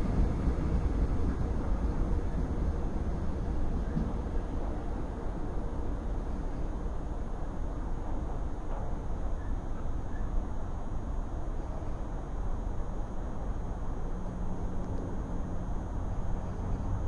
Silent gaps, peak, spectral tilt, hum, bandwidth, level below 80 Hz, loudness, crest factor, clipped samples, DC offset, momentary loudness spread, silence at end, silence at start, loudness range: none; -16 dBFS; -8.5 dB/octave; none; 7.2 kHz; -34 dBFS; -37 LUFS; 14 dB; under 0.1%; under 0.1%; 7 LU; 0 s; 0 s; 5 LU